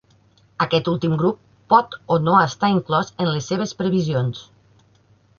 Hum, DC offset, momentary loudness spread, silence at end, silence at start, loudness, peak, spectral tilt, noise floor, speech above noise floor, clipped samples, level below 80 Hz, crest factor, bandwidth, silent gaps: none; under 0.1%; 8 LU; 0.95 s; 0.6 s; -20 LUFS; -2 dBFS; -6.5 dB/octave; -56 dBFS; 37 dB; under 0.1%; -56 dBFS; 20 dB; 7.2 kHz; none